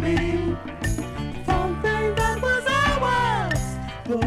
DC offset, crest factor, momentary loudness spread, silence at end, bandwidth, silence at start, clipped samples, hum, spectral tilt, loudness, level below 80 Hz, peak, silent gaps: under 0.1%; 14 dB; 9 LU; 0 s; 15.5 kHz; 0 s; under 0.1%; none; -5.5 dB/octave; -24 LUFS; -34 dBFS; -8 dBFS; none